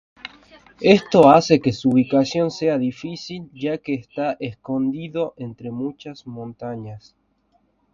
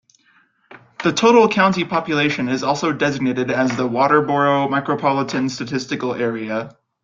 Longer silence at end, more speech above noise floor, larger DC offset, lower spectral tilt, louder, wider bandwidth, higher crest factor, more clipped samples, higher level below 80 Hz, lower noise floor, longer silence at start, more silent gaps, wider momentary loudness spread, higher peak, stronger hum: first, 0.95 s vs 0.3 s; first, 44 dB vs 40 dB; neither; first, -6.5 dB/octave vs -5 dB/octave; about the same, -19 LUFS vs -18 LUFS; about the same, 7.6 kHz vs 7.6 kHz; about the same, 20 dB vs 18 dB; neither; about the same, -58 dBFS vs -60 dBFS; first, -64 dBFS vs -58 dBFS; second, 0.25 s vs 0.7 s; neither; first, 21 LU vs 10 LU; about the same, 0 dBFS vs -2 dBFS; neither